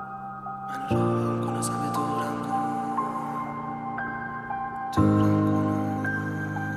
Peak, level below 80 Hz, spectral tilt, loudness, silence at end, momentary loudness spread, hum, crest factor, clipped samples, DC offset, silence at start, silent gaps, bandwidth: -10 dBFS; -54 dBFS; -7 dB/octave; -27 LUFS; 0 s; 11 LU; none; 16 dB; under 0.1%; under 0.1%; 0 s; none; 14 kHz